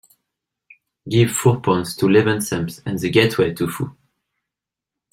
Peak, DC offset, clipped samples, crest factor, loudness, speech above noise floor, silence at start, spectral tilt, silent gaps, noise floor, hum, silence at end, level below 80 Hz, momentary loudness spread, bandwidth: -2 dBFS; under 0.1%; under 0.1%; 18 dB; -19 LUFS; 68 dB; 1.05 s; -5.5 dB/octave; none; -86 dBFS; none; 1.2 s; -54 dBFS; 9 LU; 16.5 kHz